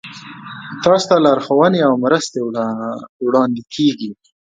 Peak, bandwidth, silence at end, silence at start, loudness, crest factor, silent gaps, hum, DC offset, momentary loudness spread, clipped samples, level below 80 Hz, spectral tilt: 0 dBFS; 9.2 kHz; 0.35 s; 0.05 s; -16 LUFS; 16 dB; 3.09-3.20 s; none; under 0.1%; 18 LU; under 0.1%; -58 dBFS; -5.5 dB/octave